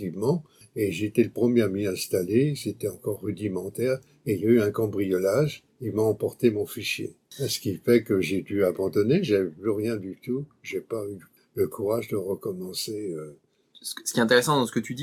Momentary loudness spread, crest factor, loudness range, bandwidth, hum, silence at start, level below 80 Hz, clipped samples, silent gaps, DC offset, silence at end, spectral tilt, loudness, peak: 12 LU; 20 dB; 5 LU; 18.5 kHz; none; 0 s; -64 dBFS; under 0.1%; none; under 0.1%; 0 s; -5.5 dB/octave; -26 LUFS; -6 dBFS